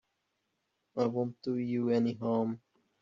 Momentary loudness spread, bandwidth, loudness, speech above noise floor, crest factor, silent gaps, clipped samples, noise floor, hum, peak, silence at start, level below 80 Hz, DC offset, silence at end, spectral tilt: 8 LU; 7.2 kHz; -33 LUFS; 50 dB; 18 dB; none; under 0.1%; -81 dBFS; none; -16 dBFS; 0.95 s; -76 dBFS; under 0.1%; 0.45 s; -7.5 dB/octave